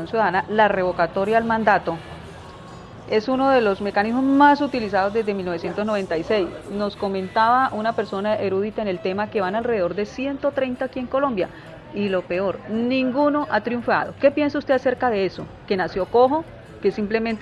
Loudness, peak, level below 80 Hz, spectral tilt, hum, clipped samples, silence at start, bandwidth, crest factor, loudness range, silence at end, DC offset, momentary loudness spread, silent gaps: -21 LUFS; -2 dBFS; -52 dBFS; -6.5 dB/octave; none; under 0.1%; 0 s; 11 kHz; 20 dB; 4 LU; 0 s; under 0.1%; 9 LU; none